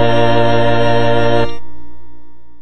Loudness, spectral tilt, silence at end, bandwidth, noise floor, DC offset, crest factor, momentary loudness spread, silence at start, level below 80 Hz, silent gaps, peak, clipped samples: -14 LUFS; -7 dB/octave; 0 s; 8.8 kHz; -35 dBFS; 30%; 12 dB; 7 LU; 0 s; -38 dBFS; none; 0 dBFS; under 0.1%